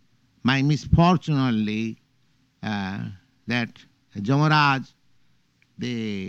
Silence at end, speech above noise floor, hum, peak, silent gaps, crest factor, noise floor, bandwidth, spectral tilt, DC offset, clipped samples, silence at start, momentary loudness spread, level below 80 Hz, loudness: 0 s; 43 dB; none; -4 dBFS; none; 20 dB; -65 dBFS; 7.6 kHz; -6.5 dB/octave; under 0.1%; under 0.1%; 0.45 s; 16 LU; -42 dBFS; -23 LUFS